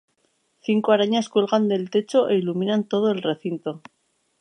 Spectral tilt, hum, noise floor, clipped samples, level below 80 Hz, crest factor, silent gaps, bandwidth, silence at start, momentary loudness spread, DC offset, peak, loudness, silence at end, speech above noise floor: -6 dB/octave; none; -68 dBFS; under 0.1%; -76 dBFS; 18 dB; none; 9.8 kHz; 0.7 s; 11 LU; under 0.1%; -6 dBFS; -22 LUFS; 0.65 s; 47 dB